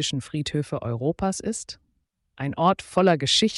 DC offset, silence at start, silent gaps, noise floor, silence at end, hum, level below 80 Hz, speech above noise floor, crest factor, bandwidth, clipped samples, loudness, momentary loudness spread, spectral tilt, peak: under 0.1%; 0 s; none; -72 dBFS; 0 s; none; -52 dBFS; 48 dB; 16 dB; 11.5 kHz; under 0.1%; -24 LUFS; 13 LU; -4.5 dB/octave; -8 dBFS